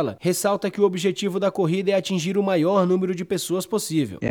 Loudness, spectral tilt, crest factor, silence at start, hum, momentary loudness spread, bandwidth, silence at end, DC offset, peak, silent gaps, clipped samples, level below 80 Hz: -22 LUFS; -5.5 dB/octave; 16 dB; 0 s; none; 5 LU; 19.5 kHz; 0 s; under 0.1%; -6 dBFS; none; under 0.1%; -66 dBFS